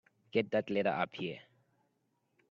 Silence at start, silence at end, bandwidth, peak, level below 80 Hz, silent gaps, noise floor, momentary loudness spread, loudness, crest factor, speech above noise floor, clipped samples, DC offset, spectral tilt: 0.35 s; 1.1 s; 7.2 kHz; -16 dBFS; -78 dBFS; none; -79 dBFS; 10 LU; -35 LUFS; 22 dB; 45 dB; under 0.1%; under 0.1%; -7.5 dB/octave